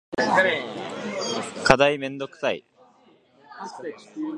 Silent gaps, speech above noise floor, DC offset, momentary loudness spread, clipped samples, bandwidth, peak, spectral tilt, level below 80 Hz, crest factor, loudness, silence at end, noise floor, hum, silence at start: none; 34 dB; under 0.1%; 18 LU; under 0.1%; 11.5 kHz; 0 dBFS; -4 dB/octave; -52 dBFS; 26 dB; -23 LUFS; 0 s; -58 dBFS; none; 0.1 s